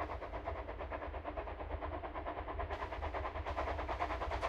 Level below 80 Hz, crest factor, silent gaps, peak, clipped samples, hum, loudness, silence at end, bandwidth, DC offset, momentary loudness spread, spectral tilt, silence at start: -46 dBFS; 18 dB; none; -24 dBFS; under 0.1%; none; -42 LUFS; 0 s; 8.8 kHz; under 0.1%; 5 LU; -6.5 dB/octave; 0 s